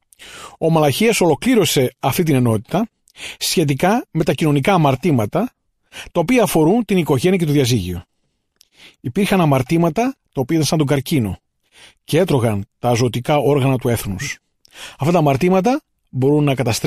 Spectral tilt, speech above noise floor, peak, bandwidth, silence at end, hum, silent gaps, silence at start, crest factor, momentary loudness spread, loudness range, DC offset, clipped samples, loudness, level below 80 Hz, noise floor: -5.5 dB/octave; 51 dB; -4 dBFS; 15.5 kHz; 0 s; none; none; 0.2 s; 14 dB; 12 LU; 2 LU; under 0.1%; under 0.1%; -17 LUFS; -46 dBFS; -68 dBFS